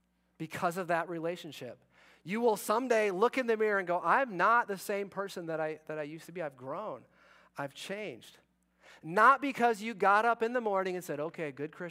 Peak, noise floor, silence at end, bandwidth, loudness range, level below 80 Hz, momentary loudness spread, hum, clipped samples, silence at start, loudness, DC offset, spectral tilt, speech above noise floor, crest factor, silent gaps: -12 dBFS; -63 dBFS; 0 s; 16 kHz; 11 LU; -82 dBFS; 16 LU; none; under 0.1%; 0.4 s; -31 LUFS; under 0.1%; -4.5 dB/octave; 32 dB; 20 dB; none